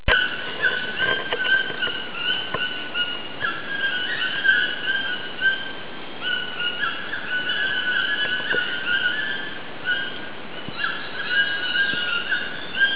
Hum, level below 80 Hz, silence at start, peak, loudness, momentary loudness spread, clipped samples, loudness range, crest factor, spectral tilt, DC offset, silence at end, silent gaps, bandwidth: none; -46 dBFS; 0 s; -6 dBFS; -23 LUFS; 8 LU; under 0.1%; 2 LU; 18 dB; 1 dB/octave; 2%; 0 s; none; 4 kHz